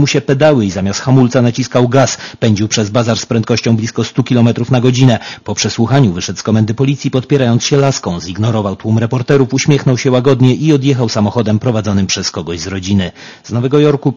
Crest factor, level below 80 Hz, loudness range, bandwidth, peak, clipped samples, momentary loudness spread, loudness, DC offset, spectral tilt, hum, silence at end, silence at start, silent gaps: 12 dB; -46 dBFS; 2 LU; 7.4 kHz; 0 dBFS; 0.4%; 6 LU; -12 LUFS; under 0.1%; -6 dB/octave; none; 0 s; 0 s; none